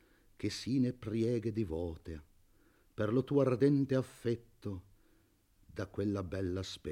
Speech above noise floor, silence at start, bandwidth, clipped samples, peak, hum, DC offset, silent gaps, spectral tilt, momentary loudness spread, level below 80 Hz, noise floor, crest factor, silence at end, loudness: 35 dB; 0.4 s; 15 kHz; under 0.1%; -18 dBFS; none; under 0.1%; none; -7.5 dB/octave; 17 LU; -62 dBFS; -69 dBFS; 18 dB; 0 s; -35 LUFS